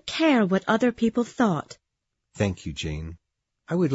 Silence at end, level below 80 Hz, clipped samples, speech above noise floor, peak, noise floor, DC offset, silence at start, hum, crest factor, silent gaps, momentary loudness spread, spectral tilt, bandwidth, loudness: 0 s; -48 dBFS; under 0.1%; 57 dB; -8 dBFS; -81 dBFS; under 0.1%; 0.05 s; none; 18 dB; none; 12 LU; -6 dB/octave; 8 kHz; -25 LUFS